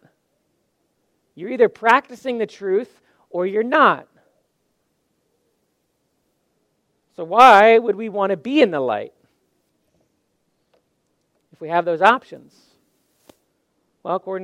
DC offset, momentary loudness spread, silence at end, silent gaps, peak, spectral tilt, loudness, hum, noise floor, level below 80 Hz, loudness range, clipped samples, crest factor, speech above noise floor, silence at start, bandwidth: under 0.1%; 20 LU; 0 s; none; 0 dBFS; -5 dB/octave; -17 LUFS; none; -70 dBFS; -68 dBFS; 8 LU; under 0.1%; 20 dB; 53 dB; 1.35 s; 15 kHz